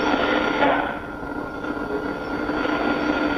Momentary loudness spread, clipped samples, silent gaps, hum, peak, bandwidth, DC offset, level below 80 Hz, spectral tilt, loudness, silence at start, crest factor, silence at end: 10 LU; under 0.1%; none; none; -6 dBFS; 15 kHz; under 0.1%; -44 dBFS; -5.5 dB/octave; -24 LUFS; 0 s; 18 dB; 0 s